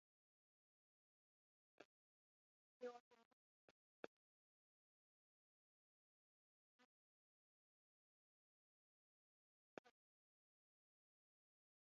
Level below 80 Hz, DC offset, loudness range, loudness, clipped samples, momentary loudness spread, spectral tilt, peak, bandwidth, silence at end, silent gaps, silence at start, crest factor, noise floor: under -90 dBFS; under 0.1%; 1 LU; -62 LUFS; under 0.1%; 8 LU; -2.5 dB/octave; -34 dBFS; 4.6 kHz; 2 s; 1.85-2.80 s, 3.00-3.11 s, 3.25-6.79 s, 6.85-9.84 s; 1.8 s; 36 dB; under -90 dBFS